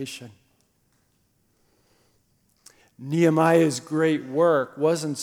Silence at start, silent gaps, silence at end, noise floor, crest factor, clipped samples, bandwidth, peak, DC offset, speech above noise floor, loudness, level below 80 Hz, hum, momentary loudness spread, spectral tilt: 0 s; none; 0 s; -67 dBFS; 18 dB; under 0.1%; 16 kHz; -6 dBFS; under 0.1%; 45 dB; -22 LUFS; -74 dBFS; none; 15 LU; -6 dB/octave